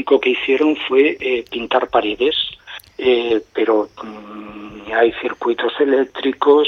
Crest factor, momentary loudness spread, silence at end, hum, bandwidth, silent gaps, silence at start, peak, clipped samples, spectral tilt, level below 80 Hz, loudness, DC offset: 16 dB; 18 LU; 0 s; none; 6.6 kHz; none; 0 s; -2 dBFS; under 0.1%; -5 dB/octave; -54 dBFS; -17 LUFS; under 0.1%